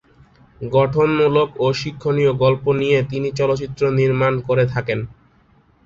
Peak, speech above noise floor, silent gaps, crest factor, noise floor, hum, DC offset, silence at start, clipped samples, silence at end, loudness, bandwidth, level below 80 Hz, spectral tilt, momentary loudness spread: -2 dBFS; 37 dB; none; 16 dB; -55 dBFS; none; under 0.1%; 0.6 s; under 0.1%; 0.75 s; -18 LUFS; 7.6 kHz; -48 dBFS; -7 dB/octave; 7 LU